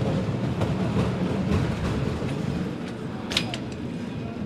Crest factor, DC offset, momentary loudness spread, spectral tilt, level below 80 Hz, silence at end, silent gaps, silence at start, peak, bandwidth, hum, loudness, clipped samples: 22 dB; under 0.1%; 8 LU; -6.5 dB/octave; -42 dBFS; 0 s; none; 0 s; -4 dBFS; 13.5 kHz; none; -27 LUFS; under 0.1%